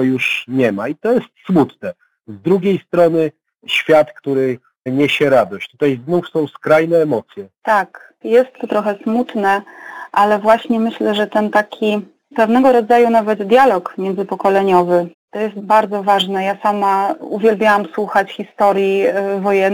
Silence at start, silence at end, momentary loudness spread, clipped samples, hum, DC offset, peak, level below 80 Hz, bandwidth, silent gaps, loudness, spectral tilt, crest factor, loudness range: 0 s; 0 s; 10 LU; under 0.1%; none; under 0.1%; -2 dBFS; -60 dBFS; 19 kHz; 15.14-15.28 s; -15 LUFS; -6 dB/octave; 14 dB; 3 LU